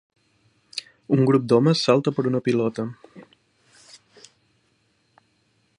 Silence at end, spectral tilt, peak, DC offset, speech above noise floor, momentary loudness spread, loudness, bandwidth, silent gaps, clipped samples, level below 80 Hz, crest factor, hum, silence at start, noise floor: 2.55 s; -6.5 dB/octave; -4 dBFS; under 0.1%; 46 dB; 17 LU; -22 LUFS; 11.5 kHz; none; under 0.1%; -66 dBFS; 22 dB; none; 0.75 s; -66 dBFS